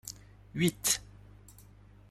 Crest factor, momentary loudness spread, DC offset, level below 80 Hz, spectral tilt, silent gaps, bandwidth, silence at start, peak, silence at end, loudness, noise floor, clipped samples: 24 dB; 18 LU; under 0.1%; -58 dBFS; -3 dB/octave; none; 15.5 kHz; 0.05 s; -12 dBFS; 0.5 s; -31 LUFS; -56 dBFS; under 0.1%